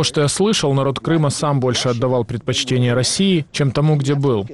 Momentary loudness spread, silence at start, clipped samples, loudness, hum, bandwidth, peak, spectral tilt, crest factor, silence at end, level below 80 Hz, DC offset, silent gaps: 3 LU; 0 s; under 0.1%; -17 LUFS; none; 12 kHz; -6 dBFS; -5 dB/octave; 10 dB; 0 s; -48 dBFS; 0.2%; none